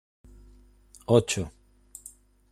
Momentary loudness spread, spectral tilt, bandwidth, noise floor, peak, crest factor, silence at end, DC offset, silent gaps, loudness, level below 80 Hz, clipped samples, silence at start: 25 LU; -5 dB/octave; 15 kHz; -55 dBFS; -6 dBFS; 24 dB; 1.05 s; under 0.1%; none; -26 LUFS; -54 dBFS; under 0.1%; 1.1 s